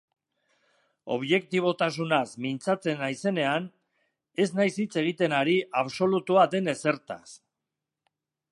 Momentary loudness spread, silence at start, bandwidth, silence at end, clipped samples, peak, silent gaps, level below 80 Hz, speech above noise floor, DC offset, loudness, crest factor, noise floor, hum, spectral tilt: 10 LU; 1.05 s; 11.5 kHz; 1.15 s; under 0.1%; -8 dBFS; none; -78 dBFS; 60 dB; under 0.1%; -26 LUFS; 20 dB; -87 dBFS; none; -5.5 dB/octave